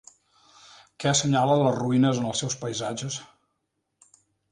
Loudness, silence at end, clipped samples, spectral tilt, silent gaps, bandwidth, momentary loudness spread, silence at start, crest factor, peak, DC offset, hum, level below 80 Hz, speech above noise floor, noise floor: -25 LUFS; 1.25 s; under 0.1%; -4.5 dB/octave; none; 11 kHz; 10 LU; 1 s; 18 dB; -8 dBFS; under 0.1%; none; -64 dBFS; 54 dB; -78 dBFS